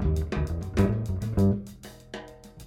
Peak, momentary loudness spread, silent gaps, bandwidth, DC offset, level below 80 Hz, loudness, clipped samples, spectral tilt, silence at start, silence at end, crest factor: -10 dBFS; 18 LU; none; 15.5 kHz; under 0.1%; -36 dBFS; -27 LUFS; under 0.1%; -8 dB/octave; 0 s; 0 s; 18 dB